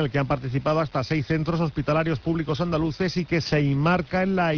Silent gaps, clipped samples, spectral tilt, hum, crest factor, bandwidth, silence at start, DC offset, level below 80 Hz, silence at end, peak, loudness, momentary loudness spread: none; under 0.1%; -7.5 dB/octave; none; 12 dB; 5.4 kHz; 0 s; under 0.1%; -44 dBFS; 0 s; -10 dBFS; -24 LUFS; 3 LU